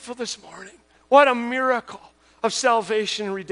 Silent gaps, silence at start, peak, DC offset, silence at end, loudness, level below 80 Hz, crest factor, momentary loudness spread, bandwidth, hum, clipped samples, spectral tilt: none; 0 s; -2 dBFS; under 0.1%; 0 s; -21 LUFS; -66 dBFS; 20 dB; 21 LU; 10.5 kHz; none; under 0.1%; -2.5 dB/octave